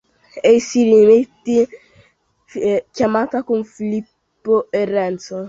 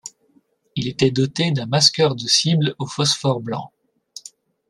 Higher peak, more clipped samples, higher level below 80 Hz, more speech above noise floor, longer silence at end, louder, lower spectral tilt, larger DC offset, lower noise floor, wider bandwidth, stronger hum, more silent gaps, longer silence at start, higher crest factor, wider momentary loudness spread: about the same, -2 dBFS vs 0 dBFS; neither; about the same, -58 dBFS vs -58 dBFS; about the same, 41 dB vs 41 dB; second, 0 s vs 0.5 s; about the same, -17 LUFS vs -18 LUFS; first, -5.5 dB/octave vs -4 dB/octave; neither; about the same, -57 dBFS vs -60 dBFS; second, 7.8 kHz vs 12.5 kHz; neither; neither; first, 0.35 s vs 0.05 s; about the same, 16 dB vs 20 dB; second, 12 LU vs 23 LU